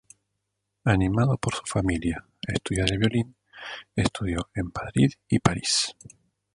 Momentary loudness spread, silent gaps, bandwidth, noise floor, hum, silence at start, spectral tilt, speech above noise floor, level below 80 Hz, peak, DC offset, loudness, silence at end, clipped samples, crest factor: 9 LU; none; 11 kHz; -80 dBFS; none; 0.85 s; -5 dB/octave; 55 dB; -42 dBFS; -2 dBFS; under 0.1%; -26 LUFS; 0.65 s; under 0.1%; 24 dB